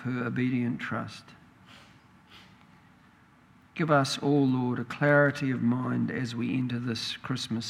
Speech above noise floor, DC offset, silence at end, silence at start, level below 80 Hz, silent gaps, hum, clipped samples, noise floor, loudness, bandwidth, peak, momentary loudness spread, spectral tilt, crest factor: 31 dB; under 0.1%; 0 s; 0 s; -68 dBFS; none; none; under 0.1%; -58 dBFS; -28 LUFS; 13 kHz; -8 dBFS; 10 LU; -6 dB/octave; 20 dB